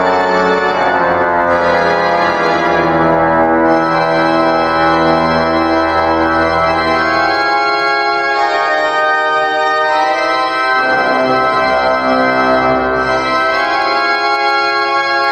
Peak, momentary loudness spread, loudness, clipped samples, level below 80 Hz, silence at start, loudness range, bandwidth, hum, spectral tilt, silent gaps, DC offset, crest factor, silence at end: -2 dBFS; 2 LU; -12 LUFS; under 0.1%; -42 dBFS; 0 s; 1 LU; 10.5 kHz; none; -5 dB/octave; none; under 0.1%; 10 dB; 0 s